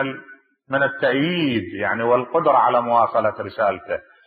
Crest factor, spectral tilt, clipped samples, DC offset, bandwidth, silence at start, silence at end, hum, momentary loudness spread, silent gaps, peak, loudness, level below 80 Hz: 16 dB; -10 dB/octave; under 0.1%; under 0.1%; 5 kHz; 0 s; 0.25 s; none; 10 LU; none; -4 dBFS; -20 LUFS; -64 dBFS